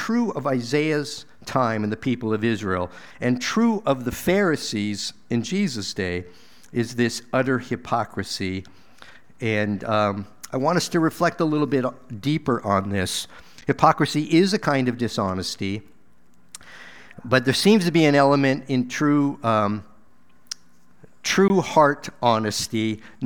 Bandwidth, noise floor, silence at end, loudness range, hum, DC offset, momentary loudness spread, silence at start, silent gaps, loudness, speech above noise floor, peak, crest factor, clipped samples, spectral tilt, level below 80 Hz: 19 kHz; -60 dBFS; 0 s; 5 LU; none; 0.5%; 13 LU; 0 s; none; -22 LUFS; 38 dB; 0 dBFS; 22 dB; under 0.1%; -5 dB/octave; -56 dBFS